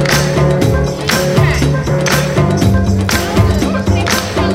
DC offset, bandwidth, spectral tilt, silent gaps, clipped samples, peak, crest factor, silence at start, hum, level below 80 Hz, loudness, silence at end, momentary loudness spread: under 0.1%; 16.5 kHz; -5 dB/octave; none; under 0.1%; 0 dBFS; 12 dB; 0 s; none; -22 dBFS; -13 LUFS; 0 s; 2 LU